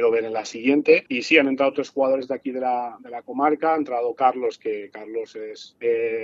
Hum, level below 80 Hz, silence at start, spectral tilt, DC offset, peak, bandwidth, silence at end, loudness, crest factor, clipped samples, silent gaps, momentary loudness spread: none; -76 dBFS; 0 s; -4.5 dB/octave; under 0.1%; -2 dBFS; 7.8 kHz; 0 s; -22 LUFS; 20 dB; under 0.1%; none; 15 LU